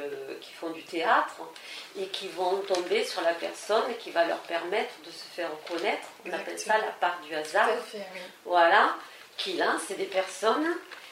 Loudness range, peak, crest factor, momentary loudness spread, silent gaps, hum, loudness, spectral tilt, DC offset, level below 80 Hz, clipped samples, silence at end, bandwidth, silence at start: 4 LU; -8 dBFS; 22 dB; 14 LU; none; none; -28 LUFS; -2 dB/octave; under 0.1%; -86 dBFS; under 0.1%; 0 s; 16 kHz; 0 s